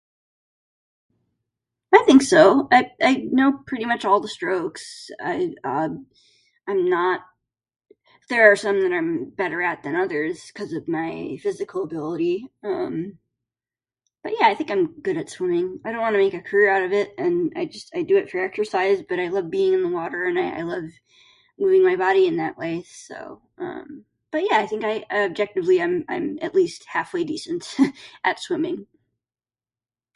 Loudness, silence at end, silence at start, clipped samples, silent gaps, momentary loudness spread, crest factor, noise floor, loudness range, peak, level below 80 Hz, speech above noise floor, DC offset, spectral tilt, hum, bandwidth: -21 LUFS; 1.3 s; 1.9 s; under 0.1%; none; 14 LU; 22 dB; under -90 dBFS; 9 LU; 0 dBFS; -66 dBFS; over 69 dB; under 0.1%; -5 dB/octave; none; 11.5 kHz